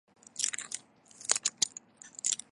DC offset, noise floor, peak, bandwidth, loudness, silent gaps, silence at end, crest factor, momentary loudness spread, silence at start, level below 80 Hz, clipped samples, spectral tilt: under 0.1%; -54 dBFS; -4 dBFS; 12 kHz; -32 LUFS; none; 0.15 s; 32 dB; 16 LU; 0.35 s; -84 dBFS; under 0.1%; 2 dB/octave